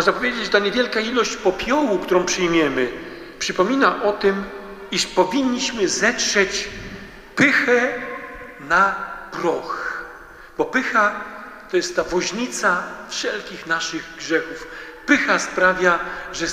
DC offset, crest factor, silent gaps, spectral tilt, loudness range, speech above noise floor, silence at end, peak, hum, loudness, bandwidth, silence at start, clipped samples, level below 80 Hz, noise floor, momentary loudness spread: under 0.1%; 20 dB; none; -3 dB/octave; 4 LU; 21 dB; 0 s; -2 dBFS; none; -20 LUFS; 15.5 kHz; 0 s; under 0.1%; -48 dBFS; -41 dBFS; 16 LU